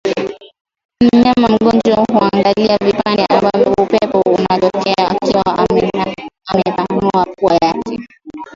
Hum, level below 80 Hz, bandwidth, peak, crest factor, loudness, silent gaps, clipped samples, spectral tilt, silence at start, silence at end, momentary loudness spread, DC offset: none; -44 dBFS; 7.6 kHz; 0 dBFS; 14 dB; -13 LUFS; 0.61-0.65 s, 0.85-0.89 s; under 0.1%; -6.5 dB/octave; 0.05 s; 0.05 s; 10 LU; under 0.1%